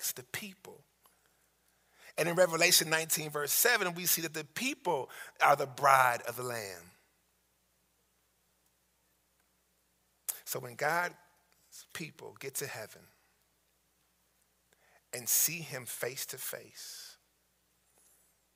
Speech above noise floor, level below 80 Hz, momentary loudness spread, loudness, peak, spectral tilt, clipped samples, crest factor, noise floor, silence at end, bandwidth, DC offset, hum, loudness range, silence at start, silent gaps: 42 dB; -82 dBFS; 19 LU; -31 LUFS; -8 dBFS; -1.5 dB/octave; under 0.1%; 26 dB; -74 dBFS; 1.45 s; 16 kHz; under 0.1%; none; 17 LU; 0 s; none